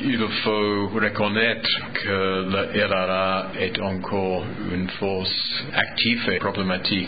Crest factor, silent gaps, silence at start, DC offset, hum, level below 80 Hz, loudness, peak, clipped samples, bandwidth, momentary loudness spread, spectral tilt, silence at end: 20 dB; none; 0 s; 0.8%; none; -48 dBFS; -23 LUFS; -4 dBFS; under 0.1%; 5 kHz; 6 LU; -10 dB/octave; 0 s